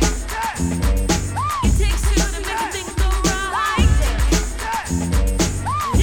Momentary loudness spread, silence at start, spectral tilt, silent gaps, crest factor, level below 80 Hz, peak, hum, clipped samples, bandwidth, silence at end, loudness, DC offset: 6 LU; 0 s; -4.5 dB/octave; none; 16 dB; -20 dBFS; -4 dBFS; none; under 0.1%; 18 kHz; 0 s; -20 LUFS; under 0.1%